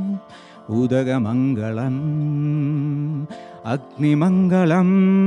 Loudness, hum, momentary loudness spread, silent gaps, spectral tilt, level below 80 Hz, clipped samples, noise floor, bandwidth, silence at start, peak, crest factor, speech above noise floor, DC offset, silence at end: -20 LUFS; none; 11 LU; none; -9 dB/octave; -62 dBFS; under 0.1%; -41 dBFS; 7 kHz; 0 s; -4 dBFS; 14 dB; 23 dB; under 0.1%; 0 s